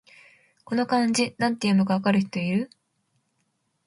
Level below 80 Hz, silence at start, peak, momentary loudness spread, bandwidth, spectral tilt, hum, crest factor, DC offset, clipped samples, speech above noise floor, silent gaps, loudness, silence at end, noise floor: -68 dBFS; 0.7 s; -10 dBFS; 7 LU; 11.5 kHz; -5.5 dB/octave; none; 16 dB; under 0.1%; under 0.1%; 50 dB; none; -24 LUFS; 1.2 s; -73 dBFS